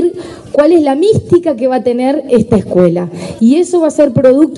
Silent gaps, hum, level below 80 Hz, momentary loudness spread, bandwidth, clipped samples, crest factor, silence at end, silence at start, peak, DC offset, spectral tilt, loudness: none; none; -44 dBFS; 7 LU; 11 kHz; 0.3%; 10 dB; 0 s; 0 s; 0 dBFS; under 0.1%; -7.5 dB/octave; -10 LUFS